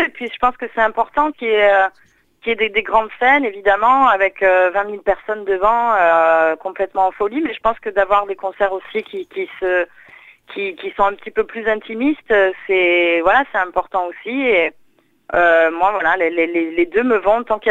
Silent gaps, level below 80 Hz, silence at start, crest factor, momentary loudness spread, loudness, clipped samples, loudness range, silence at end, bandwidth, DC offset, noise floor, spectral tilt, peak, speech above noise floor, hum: none; -48 dBFS; 0 s; 16 dB; 10 LU; -16 LUFS; under 0.1%; 6 LU; 0 s; 7.8 kHz; under 0.1%; -55 dBFS; -5 dB/octave; 0 dBFS; 38 dB; none